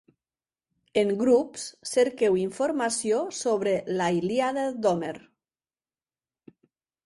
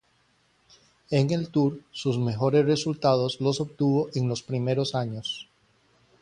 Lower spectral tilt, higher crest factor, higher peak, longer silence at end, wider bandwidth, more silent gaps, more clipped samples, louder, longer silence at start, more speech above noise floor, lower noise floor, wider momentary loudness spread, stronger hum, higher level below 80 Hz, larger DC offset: second, -4.5 dB/octave vs -6.5 dB/octave; about the same, 16 dB vs 18 dB; about the same, -10 dBFS vs -8 dBFS; first, 1.85 s vs 0.8 s; about the same, 11.5 kHz vs 10.5 kHz; neither; neither; about the same, -26 LUFS vs -26 LUFS; second, 0.95 s vs 1.1 s; first, over 65 dB vs 41 dB; first, under -90 dBFS vs -66 dBFS; about the same, 7 LU vs 8 LU; neither; second, -70 dBFS vs -62 dBFS; neither